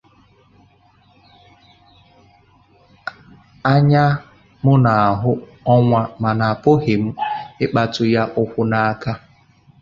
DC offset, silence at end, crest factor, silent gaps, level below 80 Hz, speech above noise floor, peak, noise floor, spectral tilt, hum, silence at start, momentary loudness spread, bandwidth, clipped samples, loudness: under 0.1%; 0.65 s; 18 dB; none; -50 dBFS; 38 dB; 0 dBFS; -54 dBFS; -8.5 dB/octave; none; 3.05 s; 12 LU; 7.2 kHz; under 0.1%; -17 LUFS